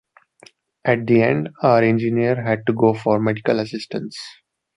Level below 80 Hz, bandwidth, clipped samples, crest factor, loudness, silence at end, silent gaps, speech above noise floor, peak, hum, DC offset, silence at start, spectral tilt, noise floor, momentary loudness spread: -60 dBFS; 11 kHz; under 0.1%; 18 dB; -19 LUFS; 0.45 s; none; 33 dB; -2 dBFS; none; under 0.1%; 0.85 s; -7.5 dB/octave; -51 dBFS; 13 LU